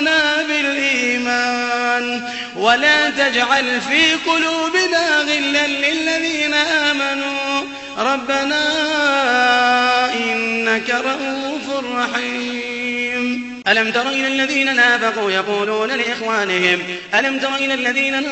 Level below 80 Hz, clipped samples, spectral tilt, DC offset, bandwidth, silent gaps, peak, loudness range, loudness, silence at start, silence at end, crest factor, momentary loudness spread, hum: -58 dBFS; under 0.1%; -2 dB/octave; under 0.1%; 8.4 kHz; none; 0 dBFS; 4 LU; -16 LUFS; 0 s; 0 s; 18 dB; 8 LU; none